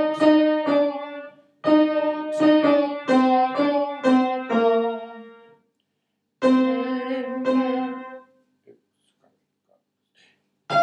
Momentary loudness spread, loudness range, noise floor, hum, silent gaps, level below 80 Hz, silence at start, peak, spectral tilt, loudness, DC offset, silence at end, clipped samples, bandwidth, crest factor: 13 LU; 9 LU; -76 dBFS; none; none; -86 dBFS; 0 s; -6 dBFS; -6 dB/octave; -21 LUFS; under 0.1%; 0 s; under 0.1%; 9 kHz; 16 dB